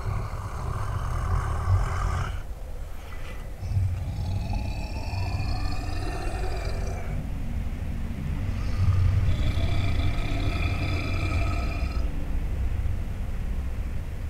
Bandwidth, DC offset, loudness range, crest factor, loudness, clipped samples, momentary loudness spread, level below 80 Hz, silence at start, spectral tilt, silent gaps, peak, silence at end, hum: 13 kHz; under 0.1%; 5 LU; 14 dB; -30 LUFS; under 0.1%; 8 LU; -30 dBFS; 0 s; -6.5 dB/octave; none; -12 dBFS; 0 s; none